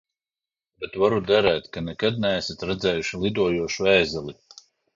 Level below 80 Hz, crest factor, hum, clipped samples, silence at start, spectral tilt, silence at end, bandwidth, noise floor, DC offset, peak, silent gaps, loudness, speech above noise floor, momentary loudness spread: -50 dBFS; 20 dB; none; under 0.1%; 0.8 s; -5 dB/octave; 0.65 s; 7.6 kHz; under -90 dBFS; under 0.1%; -4 dBFS; none; -23 LUFS; over 67 dB; 13 LU